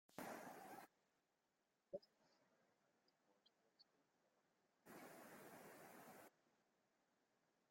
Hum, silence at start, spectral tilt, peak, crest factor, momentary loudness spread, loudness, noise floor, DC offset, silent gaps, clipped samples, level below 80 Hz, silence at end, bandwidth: none; 0.1 s; -4 dB/octave; -38 dBFS; 26 dB; 8 LU; -61 LUFS; -89 dBFS; under 0.1%; none; under 0.1%; under -90 dBFS; 1.1 s; 16.5 kHz